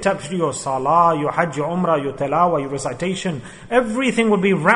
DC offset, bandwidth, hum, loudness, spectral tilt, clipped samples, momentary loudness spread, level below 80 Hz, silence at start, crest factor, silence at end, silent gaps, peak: under 0.1%; 11 kHz; none; -19 LUFS; -5.5 dB/octave; under 0.1%; 8 LU; -50 dBFS; 0 s; 18 dB; 0 s; none; 0 dBFS